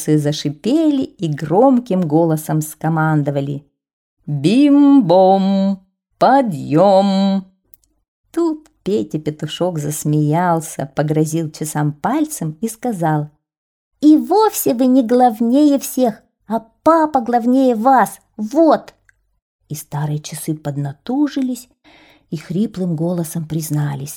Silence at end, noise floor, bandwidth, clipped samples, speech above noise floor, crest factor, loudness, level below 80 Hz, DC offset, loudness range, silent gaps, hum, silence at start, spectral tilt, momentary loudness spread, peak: 0 s; -52 dBFS; 19 kHz; under 0.1%; 37 dB; 14 dB; -16 LUFS; -58 dBFS; under 0.1%; 8 LU; 3.93-4.17 s, 8.08-8.24 s, 13.58-13.91 s, 19.42-19.59 s; none; 0 s; -6.5 dB/octave; 12 LU; -2 dBFS